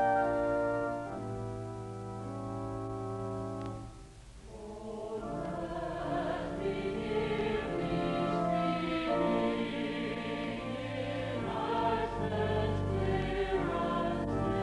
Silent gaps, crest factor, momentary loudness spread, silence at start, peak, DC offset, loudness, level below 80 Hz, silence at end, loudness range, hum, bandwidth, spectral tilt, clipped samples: none; 16 dB; 11 LU; 0 s; -18 dBFS; under 0.1%; -34 LUFS; -50 dBFS; 0 s; 8 LU; none; 11.5 kHz; -7 dB/octave; under 0.1%